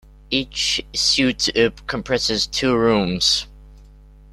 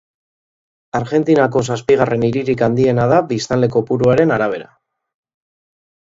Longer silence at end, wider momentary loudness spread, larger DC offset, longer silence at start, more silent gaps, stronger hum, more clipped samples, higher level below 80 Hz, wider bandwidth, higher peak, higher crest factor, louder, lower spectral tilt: second, 0.45 s vs 1.5 s; about the same, 6 LU vs 6 LU; neither; second, 0.3 s vs 0.95 s; neither; neither; neither; first, -42 dBFS vs -48 dBFS; first, 14 kHz vs 8 kHz; second, -4 dBFS vs 0 dBFS; about the same, 18 dB vs 16 dB; second, -19 LUFS vs -15 LUFS; second, -3 dB/octave vs -7 dB/octave